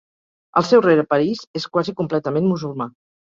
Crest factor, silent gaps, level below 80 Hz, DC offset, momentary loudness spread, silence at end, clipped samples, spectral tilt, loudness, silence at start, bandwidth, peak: 18 dB; 1.47-1.54 s; -60 dBFS; under 0.1%; 13 LU; 0.35 s; under 0.1%; -6.5 dB/octave; -19 LUFS; 0.55 s; 7.6 kHz; -2 dBFS